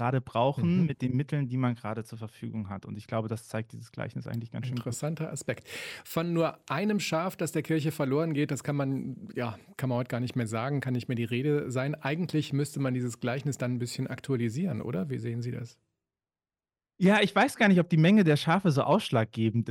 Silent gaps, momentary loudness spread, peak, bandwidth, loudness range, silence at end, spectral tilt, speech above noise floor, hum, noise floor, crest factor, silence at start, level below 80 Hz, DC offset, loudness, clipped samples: none; 14 LU; -10 dBFS; 16.5 kHz; 10 LU; 0 s; -6.5 dB/octave; over 61 dB; none; under -90 dBFS; 18 dB; 0 s; -68 dBFS; under 0.1%; -29 LUFS; under 0.1%